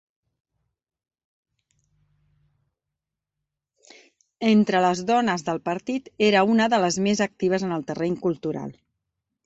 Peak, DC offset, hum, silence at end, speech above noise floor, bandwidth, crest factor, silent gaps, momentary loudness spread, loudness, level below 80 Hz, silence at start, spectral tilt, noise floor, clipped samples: -6 dBFS; under 0.1%; none; 0.75 s; 63 dB; 8.2 kHz; 20 dB; none; 10 LU; -23 LUFS; -64 dBFS; 4.4 s; -5 dB/octave; -85 dBFS; under 0.1%